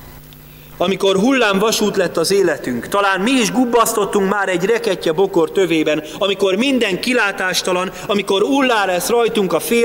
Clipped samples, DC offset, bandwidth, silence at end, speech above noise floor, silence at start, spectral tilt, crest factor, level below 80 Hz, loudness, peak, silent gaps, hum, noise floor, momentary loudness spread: under 0.1%; under 0.1%; 16.5 kHz; 0 s; 23 dB; 0 s; -3.5 dB/octave; 14 dB; -50 dBFS; -16 LUFS; -2 dBFS; none; none; -39 dBFS; 5 LU